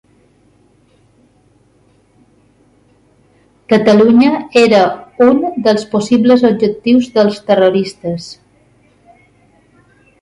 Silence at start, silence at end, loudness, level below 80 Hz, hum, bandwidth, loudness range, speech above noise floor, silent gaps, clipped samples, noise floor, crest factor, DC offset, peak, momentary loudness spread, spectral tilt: 3.7 s; 1.9 s; -11 LUFS; -54 dBFS; none; 11 kHz; 6 LU; 42 dB; none; under 0.1%; -52 dBFS; 14 dB; under 0.1%; 0 dBFS; 10 LU; -6 dB/octave